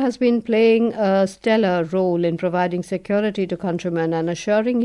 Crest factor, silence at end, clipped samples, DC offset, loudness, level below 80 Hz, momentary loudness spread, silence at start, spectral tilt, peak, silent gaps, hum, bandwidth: 12 dB; 0 s; under 0.1%; under 0.1%; -20 LUFS; -58 dBFS; 7 LU; 0 s; -6.5 dB/octave; -8 dBFS; none; none; 11.5 kHz